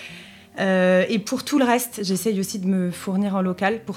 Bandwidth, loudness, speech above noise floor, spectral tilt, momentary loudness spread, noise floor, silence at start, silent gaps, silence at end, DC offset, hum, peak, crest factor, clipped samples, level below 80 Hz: 16.5 kHz; -22 LUFS; 21 dB; -5 dB/octave; 7 LU; -42 dBFS; 0 s; none; 0 s; under 0.1%; none; -6 dBFS; 16 dB; under 0.1%; -66 dBFS